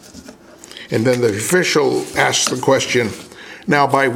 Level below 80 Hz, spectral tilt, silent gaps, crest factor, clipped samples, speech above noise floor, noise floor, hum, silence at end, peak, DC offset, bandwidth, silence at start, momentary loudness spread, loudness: -54 dBFS; -3.5 dB/octave; none; 18 dB; under 0.1%; 24 dB; -40 dBFS; none; 0 s; 0 dBFS; under 0.1%; 17 kHz; 0.15 s; 18 LU; -16 LUFS